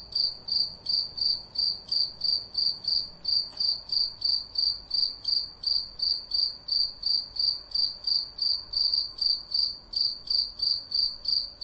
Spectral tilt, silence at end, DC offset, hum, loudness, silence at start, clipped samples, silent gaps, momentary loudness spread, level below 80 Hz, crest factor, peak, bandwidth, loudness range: -1.5 dB/octave; 0 s; under 0.1%; none; -26 LUFS; 0 s; under 0.1%; none; 2 LU; -56 dBFS; 16 dB; -14 dBFS; 8.8 kHz; 1 LU